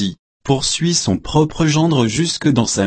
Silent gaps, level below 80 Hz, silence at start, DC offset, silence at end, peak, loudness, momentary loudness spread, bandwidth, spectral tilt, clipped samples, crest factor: 0.19-0.40 s; -40 dBFS; 0 s; under 0.1%; 0 s; -2 dBFS; -16 LUFS; 4 LU; 8.8 kHz; -4.5 dB/octave; under 0.1%; 14 dB